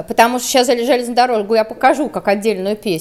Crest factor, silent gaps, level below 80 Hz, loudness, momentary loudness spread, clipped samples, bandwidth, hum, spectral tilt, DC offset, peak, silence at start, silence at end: 14 dB; none; -52 dBFS; -15 LUFS; 4 LU; under 0.1%; 16 kHz; none; -3.5 dB/octave; under 0.1%; 0 dBFS; 0 s; 0 s